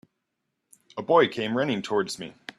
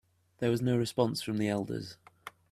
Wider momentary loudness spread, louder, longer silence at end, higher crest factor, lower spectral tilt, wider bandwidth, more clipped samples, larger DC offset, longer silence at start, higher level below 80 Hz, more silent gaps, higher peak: second, 16 LU vs 20 LU; first, -25 LUFS vs -32 LUFS; about the same, 0.3 s vs 0.2 s; about the same, 20 dB vs 20 dB; about the same, -5 dB/octave vs -6 dB/octave; second, 13 kHz vs 15 kHz; neither; neither; first, 0.95 s vs 0.4 s; about the same, -68 dBFS vs -68 dBFS; neither; first, -6 dBFS vs -14 dBFS